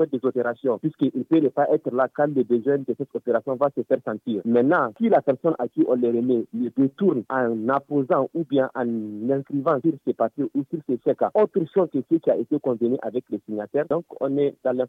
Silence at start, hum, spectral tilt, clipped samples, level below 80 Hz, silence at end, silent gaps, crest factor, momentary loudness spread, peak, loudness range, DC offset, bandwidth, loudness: 0 s; none; -10 dB/octave; under 0.1%; -76 dBFS; 0 s; none; 16 dB; 6 LU; -8 dBFS; 2 LU; under 0.1%; 4.2 kHz; -23 LUFS